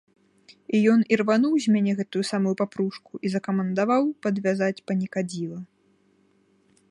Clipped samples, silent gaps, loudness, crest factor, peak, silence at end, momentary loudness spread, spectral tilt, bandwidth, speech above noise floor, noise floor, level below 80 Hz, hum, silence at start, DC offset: under 0.1%; none; -24 LUFS; 18 dB; -6 dBFS; 1.25 s; 9 LU; -6.5 dB/octave; 11.5 kHz; 40 dB; -64 dBFS; -72 dBFS; none; 0.7 s; under 0.1%